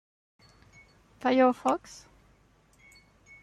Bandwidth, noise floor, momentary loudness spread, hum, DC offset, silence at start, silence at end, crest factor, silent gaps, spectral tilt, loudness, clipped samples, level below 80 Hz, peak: 12 kHz; -63 dBFS; 26 LU; none; under 0.1%; 1.25 s; 1.65 s; 20 dB; none; -4.5 dB/octave; -26 LUFS; under 0.1%; -66 dBFS; -12 dBFS